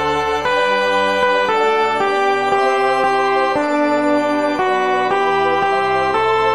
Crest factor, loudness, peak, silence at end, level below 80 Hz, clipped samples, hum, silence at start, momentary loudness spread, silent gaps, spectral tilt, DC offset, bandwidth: 12 dB; -16 LUFS; -4 dBFS; 0 s; -50 dBFS; under 0.1%; none; 0 s; 2 LU; none; -4 dB/octave; 0.5%; 13 kHz